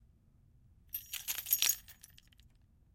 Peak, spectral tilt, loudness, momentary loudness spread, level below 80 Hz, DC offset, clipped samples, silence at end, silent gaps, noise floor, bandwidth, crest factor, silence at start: -10 dBFS; 2 dB/octave; -34 LUFS; 22 LU; -68 dBFS; under 0.1%; under 0.1%; 1 s; none; -66 dBFS; 17 kHz; 32 dB; 0.95 s